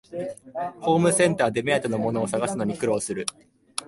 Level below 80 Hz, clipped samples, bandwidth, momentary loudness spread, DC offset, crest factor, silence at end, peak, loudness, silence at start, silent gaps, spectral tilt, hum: -60 dBFS; under 0.1%; 11.5 kHz; 14 LU; under 0.1%; 20 dB; 0.05 s; -6 dBFS; -24 LUFS; 0.1 s; none; -4.5 dB/octave; none